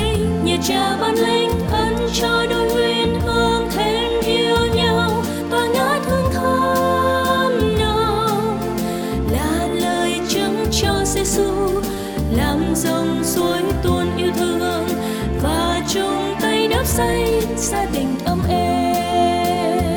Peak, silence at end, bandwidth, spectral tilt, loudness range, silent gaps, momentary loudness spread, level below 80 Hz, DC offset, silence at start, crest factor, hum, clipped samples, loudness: -4 dBFS; 0 s; over 20 kHz; -4.5 dB/octave; 2 LU; none; 4 LU; -32 dBFS; under 0.1%; 0 s; 14 dB; none; under 0.1%; -18 LUFS